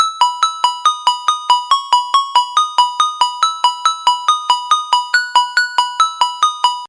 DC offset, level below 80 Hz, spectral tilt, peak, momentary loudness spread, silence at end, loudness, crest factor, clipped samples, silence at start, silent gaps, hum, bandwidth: under 0.1%; -90 dBFS; 5 dB/octave; 0 dBFS; 2 LU; 0 s; -14 LUFS; 14 dB; under 0.1%; 0 s; none; none; 11.5 kHz